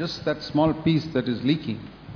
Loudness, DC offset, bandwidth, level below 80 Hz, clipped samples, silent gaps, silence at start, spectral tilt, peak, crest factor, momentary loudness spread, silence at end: -25 LUFS; under 0.1%; 5.4 kHz; -50 dBFS; under 0.1%; none; 0 s; -7.5 dB/octave; -10 dBFS; 16 dB; 8 LU; 0 s